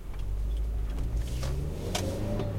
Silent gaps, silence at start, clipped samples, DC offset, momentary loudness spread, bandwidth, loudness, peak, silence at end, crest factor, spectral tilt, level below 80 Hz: none; 0 s; under 0.1%; under 0.1%; 3 LU; 16 kHz; -34 LUFS; -16 dBFS; 0 s; 16 dB; -5.5 dB/octave; -32 dBFS